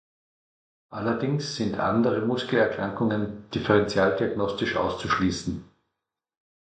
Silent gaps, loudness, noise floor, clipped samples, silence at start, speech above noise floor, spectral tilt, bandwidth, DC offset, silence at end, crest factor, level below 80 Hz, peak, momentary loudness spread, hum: none; -25 LUFS; -85 dBFS; under 0.1%; 0.9 s; 60 dB; -6 dB/octave; 9.2 kHz; under 0.1%; 1.1 s; 20 dB; -52 dBFS; -6 dBFS; 9 LU; none